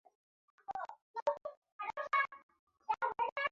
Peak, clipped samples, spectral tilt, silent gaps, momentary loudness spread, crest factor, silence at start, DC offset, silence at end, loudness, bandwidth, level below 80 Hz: -20 dBFS; under 0.1%; 1.5 dB/octave; 1.02-1.14 s, 1.22-1.26 s, 1.57-1.62 s, 1.72-1.79 s, 2.43-2.49 s, 2.59-2.67 s, 3.32-3.36 s; 17 LU; 20 dB; 0.7 s; under 0.1%; 0.05 s; -39 LUFS; 7.4 kHz; -82 dBFS